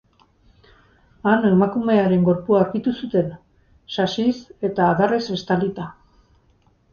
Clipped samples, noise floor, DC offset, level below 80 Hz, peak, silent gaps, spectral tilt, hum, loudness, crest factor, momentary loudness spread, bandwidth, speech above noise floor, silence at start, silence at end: under 0.1%; -59 dBFS; under 0.1%; -54 dBFS; -4 dBFS; none; -7.5 dB/octave; none; -20 LUFS; 18 dB; 10 LU; 7 kHz; 40 dB; 1.25 s; 1 s